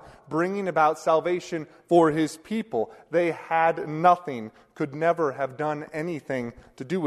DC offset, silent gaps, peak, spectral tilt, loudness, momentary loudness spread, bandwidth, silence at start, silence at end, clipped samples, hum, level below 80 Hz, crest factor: under 0.1%; none; -6 dBFS; -6.5 dB/octave; -25 LUFS; 13 LU; 13 kHz; 0.05 s; 0 s; under 0.1%; none; -64 dBFS; 20 dB